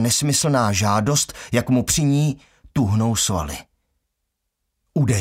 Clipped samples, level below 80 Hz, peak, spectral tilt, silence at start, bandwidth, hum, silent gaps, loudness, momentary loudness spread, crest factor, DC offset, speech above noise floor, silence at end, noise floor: under 0.1%; -42 dBFS; -6 dBFS; -4.5 dB/octave; 0 s; 16 kHz; none; none; -20 LUFS; 10 LU; 16 dB; under 0.1%; 58 dB; 0 s; -77 dBFS